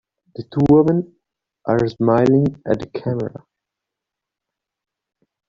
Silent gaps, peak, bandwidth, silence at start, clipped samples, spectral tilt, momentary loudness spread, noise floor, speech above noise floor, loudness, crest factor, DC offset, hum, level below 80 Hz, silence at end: none; -4 dBFS; 7.4 kHz; 0.4 s; under 0.1%; -8.5 dB/octave; 17 LU; -84 dBFS; 67 dB; -18 LUFS; 18 dB; under 0.1%; none; -50 dBFS; 2.2 s